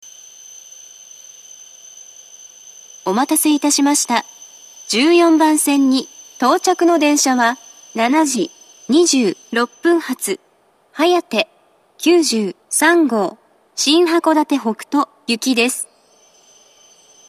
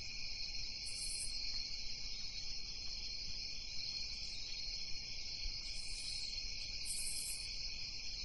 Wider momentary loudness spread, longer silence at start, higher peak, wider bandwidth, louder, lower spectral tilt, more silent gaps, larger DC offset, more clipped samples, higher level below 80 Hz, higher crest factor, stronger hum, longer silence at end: first, 24 LU vs 3 LU; about the same, 0.05 s vs 0 s; first, 0 dBFS vs -28 dBFS; first, 14.5 kHz vs 11.5 kHz; first, -16 LUFS vs -42 LUFS; first, -2 dB/octave vs 0 dB/octave; neither; second, under 0.1% vs 0.2%; neither; second, -76 dBFS vs -52 dBFS; about the same, 18 dB vs 14 dB; neither; first, 1.45 s vs 0 s